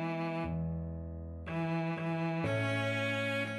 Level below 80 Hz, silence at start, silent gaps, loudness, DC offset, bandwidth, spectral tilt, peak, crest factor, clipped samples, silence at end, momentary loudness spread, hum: -52 dBFS; 0 s; none; -35 LUFS; under 0.1%; 12 kHz; -6.5 dB/octave; -22 dBFS; 14 dB; under 0.1%; 0 s; 9 LU; none